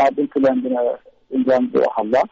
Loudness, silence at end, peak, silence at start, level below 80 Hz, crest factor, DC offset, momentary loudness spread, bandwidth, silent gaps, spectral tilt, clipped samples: -19 LUFS; 0.05 s; -8 dBFS; 0 s; -58 dBFS; 10 dB; under 0.1%; 7 LU; 7.6 kHz; none; -5 dB/octave; under 0.1%